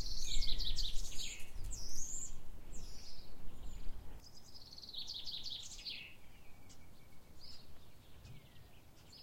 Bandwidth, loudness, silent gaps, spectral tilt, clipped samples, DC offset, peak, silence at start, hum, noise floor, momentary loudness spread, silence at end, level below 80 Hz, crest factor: 14.5 kHz; -45 LUFS; none; -1.5 dB/octave; under 0.1%; under 0.1%; -20 dBFS; 0 s; none; -58 dBFS; 22 LU; 0 s; -46 dBFS; 16 dB